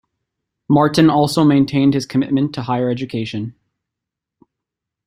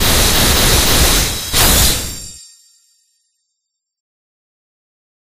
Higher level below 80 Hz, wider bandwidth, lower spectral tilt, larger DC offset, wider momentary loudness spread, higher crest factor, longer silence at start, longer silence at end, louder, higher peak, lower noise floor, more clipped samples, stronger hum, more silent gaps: second, -54 dBFS vs -22 dBFS; about the same, 15.5 kHz vs 15.5 kHz; first, -6.5 dB/octave vs -2 dB/octave; neither; second, 11 LU vs 14 LU; about the same, 16 dB vs 16 dB; first, 0.7 s vs 0 s; second, 1.55 s vs 3 s; second, -16 LUFS vs -11 LUFS; about the same, -2 dBFS vs 0 dBFS; first, -83 dBFS vs -75 dBFS; neither; neither; neither